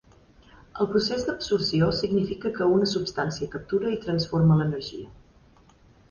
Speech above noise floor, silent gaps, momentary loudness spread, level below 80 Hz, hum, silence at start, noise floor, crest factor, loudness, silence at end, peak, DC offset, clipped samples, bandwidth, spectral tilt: 32 dB; none; 12 LU; -50 dBFS; none; 0.75 s; -56 dBFS; 16 dB; -25 LUFS; 0.95 s; -10 dBFS; under 0.1%; under 0.1%; 7.2 kHz; -6.5 dB/octave